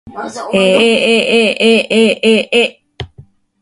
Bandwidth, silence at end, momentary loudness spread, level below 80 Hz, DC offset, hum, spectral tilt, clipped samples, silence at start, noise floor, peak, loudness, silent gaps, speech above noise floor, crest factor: 11.5 kHz; 0.4 s; 20 LU; -48 dBFS; under 0.1%; none; -4 dB/octave; under 0.1%; 0.05 s; -42 dBFS; 0 dBFS; -11 LUFS; none; 31 dB; 12 dB